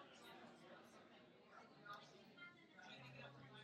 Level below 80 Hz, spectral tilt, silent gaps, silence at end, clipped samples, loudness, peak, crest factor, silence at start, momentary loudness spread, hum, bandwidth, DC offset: under -90 dBFS; -4.5 dB/octave; none; 0 s; under 0.1%; -62 LUFS; -46 dBFS; 16 dB; 0 s; 7 LU; none; 13 kHz; under 0.1%